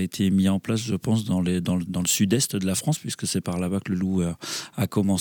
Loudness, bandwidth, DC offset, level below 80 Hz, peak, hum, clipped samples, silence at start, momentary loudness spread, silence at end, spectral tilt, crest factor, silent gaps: -24 LUFS; over 20 kHz; under 0.1%; -54 dBFS; -8 dBFS; none; under 0.1%; 0 s; 6 LU; 0 s; -5 dB/octave; 16 dB; none